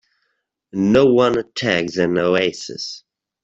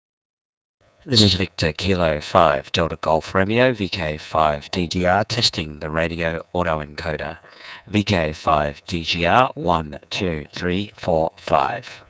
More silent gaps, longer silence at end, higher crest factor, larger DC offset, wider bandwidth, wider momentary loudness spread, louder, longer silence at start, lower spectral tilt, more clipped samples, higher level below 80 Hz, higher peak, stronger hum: neither; first, 0.45 s vs 0.1 s; about the same, 16 dB vs 20 dB; neither; about the same, 8 kHz vs 8 kHz; first, 16 LU vs 10 LU; about the same, -18 LUFS vs -20 LUFS; second, 0.75 s vs 1.05 s; about the same, -5.5 dB/octave vs -5 dB/octave; neither; second, -54 dBFS vs -38 dBFS; about the same, -2 dBFS vs 0 dBFS; neither